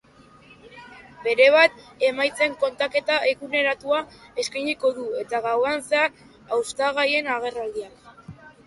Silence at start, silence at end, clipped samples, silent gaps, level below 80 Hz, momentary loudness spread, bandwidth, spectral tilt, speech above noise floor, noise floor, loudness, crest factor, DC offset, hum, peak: 0.65 s; 0.15 s; under 0.1%; none; -64 dBFS; 12 LU; 11.5 kHz; -2.5 dB/octave; 29 dB; -51 dBFS; -22 LUFS; 22 dB; under 0.1%; none; -2 dBFS